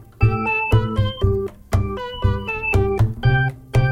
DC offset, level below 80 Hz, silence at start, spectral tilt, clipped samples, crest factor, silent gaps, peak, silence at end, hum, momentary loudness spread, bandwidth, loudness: under 0.1%; -28 dBFS; 0 s; -7.5 dB/octave; under 0.1%; 16 dB; none; -4 dBFS; 0 s; none; 5 LU; 12.5 kHz; -20 LUFS